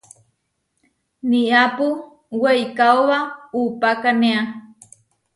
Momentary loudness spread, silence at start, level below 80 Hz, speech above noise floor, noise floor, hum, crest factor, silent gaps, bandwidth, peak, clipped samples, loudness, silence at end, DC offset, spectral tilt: 13 LU; 1.25 s; -68 dBFS; 54 dB; -72 dBFS; none; 18 dB; none; 11.5 kHz; -2 dBFS; under 0.1%; -18 LUFS; 0.75 s; under 0.1%; -4.5 dB/octave